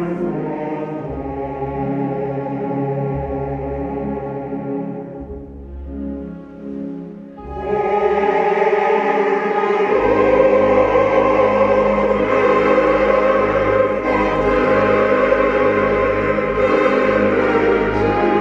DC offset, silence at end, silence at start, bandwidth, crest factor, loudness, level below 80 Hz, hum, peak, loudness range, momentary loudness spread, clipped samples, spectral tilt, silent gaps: under 0.1%; 0 s; 0 s; 7.4 kHz; 16 dB; -17 LUFS; -38 dBFS; none; -2 dBFS; 12 LU; 15 LU; under 0.1%; -7.5 dB/octave; none